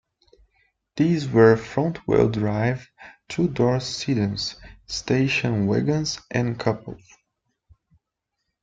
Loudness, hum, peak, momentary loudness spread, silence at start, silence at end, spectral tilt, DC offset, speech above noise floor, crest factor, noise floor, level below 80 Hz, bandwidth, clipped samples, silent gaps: -22 LUFS; none; -2 dBFS; 14 LU; 0.95 s; 1.65 s; -6 dB/octave; under 0.1%; 59 dB; 22 dB; -81 dBFS; -52 dBFS; 9 kHz; under 0.1%; none